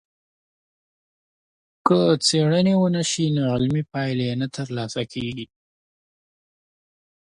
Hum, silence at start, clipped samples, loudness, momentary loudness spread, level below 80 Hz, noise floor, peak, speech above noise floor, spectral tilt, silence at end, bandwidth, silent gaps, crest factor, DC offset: none; 1.85 s; under 0.1%; -22 LUFS; 11 LU; -58 dBFS; under -90 dBFS; -2 dBFS; over 69 dB; -5.5 dB/octave; 1.95 s; 11.5 kHz; none; 22 dB; under 0.1%